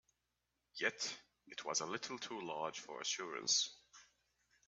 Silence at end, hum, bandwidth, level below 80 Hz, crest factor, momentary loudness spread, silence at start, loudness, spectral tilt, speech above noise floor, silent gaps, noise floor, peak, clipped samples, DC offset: 0.65 s; none; 10 kHz; -88 dBFS; 22 dB; 16 LU; 0.75 s; -40 LUFS; -0.5 dB/octave; 45 dB; none; -87 dBFS; -22 dBFS; under 0.1%; under 0.1%